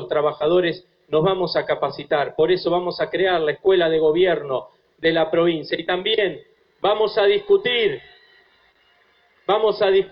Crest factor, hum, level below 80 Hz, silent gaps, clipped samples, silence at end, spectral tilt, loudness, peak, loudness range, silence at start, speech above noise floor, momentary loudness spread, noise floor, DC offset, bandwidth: 14 dB; none; -56 dBFS; none; under 0.1%; 0.05 s; -8.5 dB/octave; -20 LUFS; -6 dBFS; 2 LU; 0 s; 40 dB; 7 LU; -59 dBFS; under 0.1%; 5.6 kHz